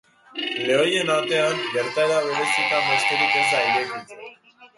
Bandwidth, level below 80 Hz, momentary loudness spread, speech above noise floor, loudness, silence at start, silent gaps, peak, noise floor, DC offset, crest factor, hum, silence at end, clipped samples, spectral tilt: 11.5 kHz; -70 dBFS; 12 LU; 27 dB; -21 LUFS; 0.35 s; none; -6 dBFS; -48 dBFS; under 0.1%; 16 dB; none; 0.1 s; under 0.1%; -2.5 dB/octave